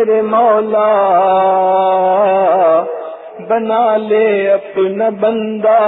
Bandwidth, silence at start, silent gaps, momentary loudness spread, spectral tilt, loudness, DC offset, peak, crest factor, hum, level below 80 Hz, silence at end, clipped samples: 4 kHz; 0 s; none; 6 LU; -10 dB/octave; -12 LUFS; under 0.1%; -2 dBFS; 10 dB; none; -62 dBFS; 0 s; under 0.1%